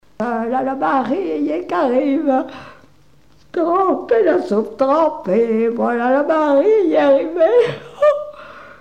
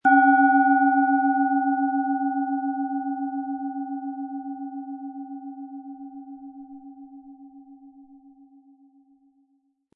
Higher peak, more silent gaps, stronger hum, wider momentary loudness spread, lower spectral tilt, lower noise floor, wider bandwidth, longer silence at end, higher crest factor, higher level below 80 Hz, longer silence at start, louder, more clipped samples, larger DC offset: about the same, -4 dBFS vs -6 dBFS; neither; neither; second, 8 LU vs 25 LU; about the same, -7 dB/octave vs -7.5 dB/octave; second, -53 dBFS vs -68 dBFS; first, 9 kHz vs 3.4 kHz; second, 0.05 s vs 1.95 s; about the same, 14 dB vs 18 dB; first, -58 dBFS vs -78 dBFS; first, 0.2 s vs 0.05 s; first, -16 LUFS vs -23 LUFS; neither; first, 0.3% vs under 0.1%